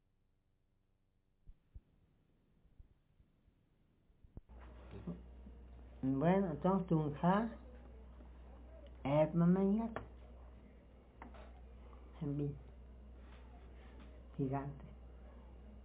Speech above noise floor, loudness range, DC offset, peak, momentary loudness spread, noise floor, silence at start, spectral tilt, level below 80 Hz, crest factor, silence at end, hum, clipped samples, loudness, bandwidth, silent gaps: 43 dB; 12 LU; under 0.1%; -20 dBFS; 24 LU; -77 dBFS; 1.5 s; -8.5 dB/octave; -58 dBFS; 20 dB; 0 s; none; under 0.1%; -37 LUFS; 4 kHz; none